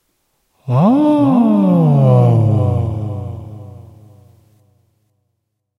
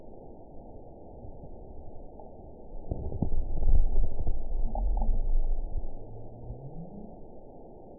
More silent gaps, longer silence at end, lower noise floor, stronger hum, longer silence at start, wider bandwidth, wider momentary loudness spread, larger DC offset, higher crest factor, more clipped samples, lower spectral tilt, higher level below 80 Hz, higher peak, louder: neither; first, 2 s vs 0.05 s; first, -72 dBFS vs -48 dBFS; neither; first, 0.65 s vs 0.05 s; first, 5.6 kHz vs 1 kHz; first, 20 LU vs 17 LU; second, under 0.1% vs 0.3%; about the same, 14 dB vs 16 dB; neither; second, -11 dB/octave vs -16 dB/octave; second, -46 dBFS vs -30 dBFS; first, 0 dBFS vs -10 dBFS; first, -13 LUFS vs -36 LUFS